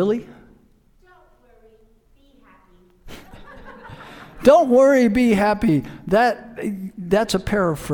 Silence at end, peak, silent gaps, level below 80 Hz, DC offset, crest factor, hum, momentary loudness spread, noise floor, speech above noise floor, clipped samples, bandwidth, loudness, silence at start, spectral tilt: 0 s; 0 dBFS; none; -44 dBFS; under 0.1%; 20 dB; none; 26 LU; -55 dBFS; 38 dB; under 0.1%; 19 kHz; -18 LUFS; 0 s; -6 dB/octave